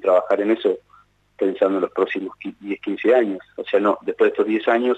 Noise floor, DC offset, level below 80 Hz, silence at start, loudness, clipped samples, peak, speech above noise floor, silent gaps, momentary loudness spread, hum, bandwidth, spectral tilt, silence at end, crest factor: -55 dBFS; under 0.1%; -68 dBFS; 0 s; -21 LUFS; under 0.1%; -6 dBFS; 35 dB; none; 11 LU; 50 Hz at -65 dBFS; 8.2 kHz; -7 dB/octave; 0 s; 14 dB